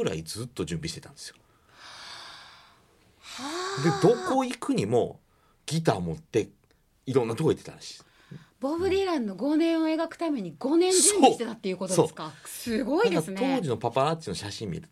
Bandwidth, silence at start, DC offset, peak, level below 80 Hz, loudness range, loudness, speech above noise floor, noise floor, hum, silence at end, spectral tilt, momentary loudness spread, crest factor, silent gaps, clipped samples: 15.5 kHz; 0 s; under 0.1%; -4 dBFS; -62 dBFS; 6 LU; -27 LUFS; 34 dB; -61 dBFS; none; 0.05 s; -4.5 dB/octave; 20 LU; 22 dB; none; under 0.1%